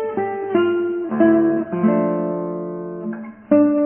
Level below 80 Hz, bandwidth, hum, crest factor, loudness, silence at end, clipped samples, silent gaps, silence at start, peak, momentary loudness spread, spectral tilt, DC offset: -60 dBFS; 3.3 kHz; none; 14 dB; -19 LUFS; 0 s; under 0.1%; none; 0 s; -4 dBFS; 13 LU; -12 dB/octave; under 0.1%